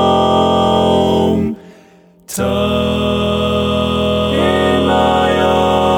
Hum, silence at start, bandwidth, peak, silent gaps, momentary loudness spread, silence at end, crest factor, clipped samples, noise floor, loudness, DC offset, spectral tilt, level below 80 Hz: none; 0 s; 18.5 kHz; -2 dBFS; none; 5 LU; 0 s; 12 dB; under 0.1%; -45 dBFS; -14 LUFS; under 0.1%; -5.5 dB/octave; -32 dBFS